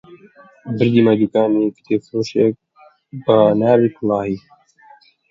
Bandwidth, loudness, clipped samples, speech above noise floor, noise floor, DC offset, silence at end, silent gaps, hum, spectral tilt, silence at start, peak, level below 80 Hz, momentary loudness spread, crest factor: 7.6 kHz; -16 LUFS; under 0.1%; 33 dB; -49 dBFS; under 0.1%; 0.95 s; none; none; -8 dB/octave; 0.1 s; 0 dBFS; -58 dBFS; 13 LU; 18 dB